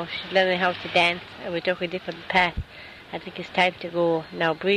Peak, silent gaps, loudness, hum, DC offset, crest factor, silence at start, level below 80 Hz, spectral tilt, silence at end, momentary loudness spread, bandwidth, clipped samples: -6 dBFS; none; -24 LUFS; none; under 0.1%; 18 dB; 0 s; -48 dBFS; -5 dB/octave; 0 s; 15 LU; 12.5 kHz; under 0.1%